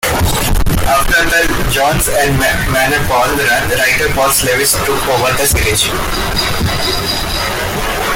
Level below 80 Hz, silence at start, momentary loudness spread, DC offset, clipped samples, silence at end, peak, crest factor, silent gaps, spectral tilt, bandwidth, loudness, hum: -22 dBFS; 0 s; 5 LU; under 0.1%; under 0.1%; 0 s; 0 dBFS; 12 dB; none; -3 dB/octave; 17 kHz; -12 LUFS; none